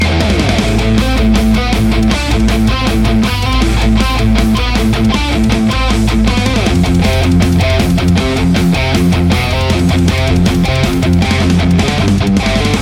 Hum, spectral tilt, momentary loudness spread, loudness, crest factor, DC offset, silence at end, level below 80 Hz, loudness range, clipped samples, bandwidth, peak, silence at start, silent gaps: none; -6 dB/octave; 2 LU; -12 LUFS; 10 dB; under 0.1%; 0 s; -16 dBFS; 1 LU; under 0.1%; 16.5 kHz; 0 dBFS; 0 s; none